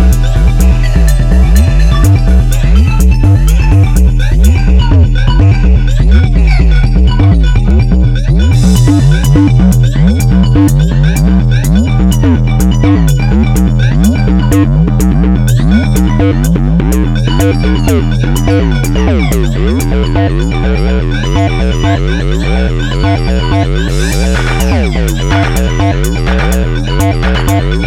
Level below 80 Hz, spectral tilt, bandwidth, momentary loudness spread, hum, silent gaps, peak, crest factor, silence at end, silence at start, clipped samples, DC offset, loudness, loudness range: -10 dBFS; -6.5 dB/octave; 15.5 kHz; 4 LU; none; none; 0 dBFS; 8 dB; 0 s; 0 s; 1%; under 0.1%; -9 LUFS; 4 LU